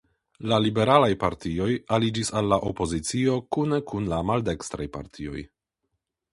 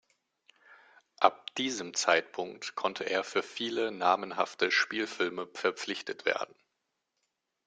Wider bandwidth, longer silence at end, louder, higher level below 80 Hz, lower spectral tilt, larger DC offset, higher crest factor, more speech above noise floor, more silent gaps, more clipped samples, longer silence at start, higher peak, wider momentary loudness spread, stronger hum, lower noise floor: first, 11.5 kHz vs 9.6 kHz; second, 0.85 s vs 1.2 s; first, -25 LUFS vs -31 LUFS; first, -46 dBFS vs -80 dBFS; first, -5.5 dB/octave vs -2 dB/octave; neither; second, 22 dB vs 28 dB; first, 55 dB vs 51 dB; neither; neither; second, 0.4 s vs 0.7 s; first, -2 dBFS vs -6 dBFS; first, 16 LU vs 9 LU; neither; about the same, -80 dBFS vs -83 dBFS